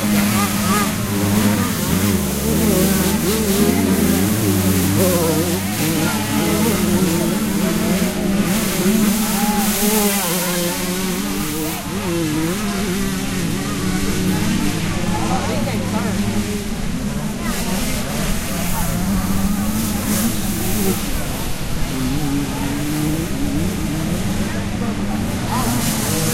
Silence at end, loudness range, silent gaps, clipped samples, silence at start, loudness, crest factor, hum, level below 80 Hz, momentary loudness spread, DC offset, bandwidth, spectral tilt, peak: 0 s; 5 LU; none; under 0.1%; 0 s; -19 LUFS; 16 dB; none; -30 dBFS; 6 LU; under 0.1%; 16 kHz; -4.5 dB/octave; -2 dBFS